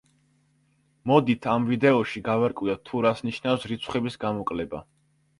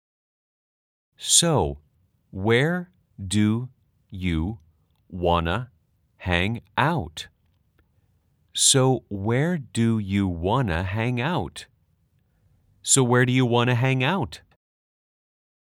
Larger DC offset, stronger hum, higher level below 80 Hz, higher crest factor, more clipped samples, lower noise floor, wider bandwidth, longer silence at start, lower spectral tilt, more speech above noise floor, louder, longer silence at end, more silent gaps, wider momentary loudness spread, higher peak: neither; neither; second, -58 dBFS vs -50 dBFS; about the same, 22 dB vs 22 dB; neither; about the same, -66 dBFS vs -66 dBFS; second, 11 kHz vs 16.5 kHz; second, 1.05 s vs 1.2 s; first, -7 dB/octave vs -4 dB/octave; about the same, 42 dB vs 43 dB; about the same, -25 LUFS vs -23 LUFS; second, 0.55 s vs 1.25 s; neither; second, 9 LU vs 22 LU; about the same, -4 dBFS vs -2 dBFS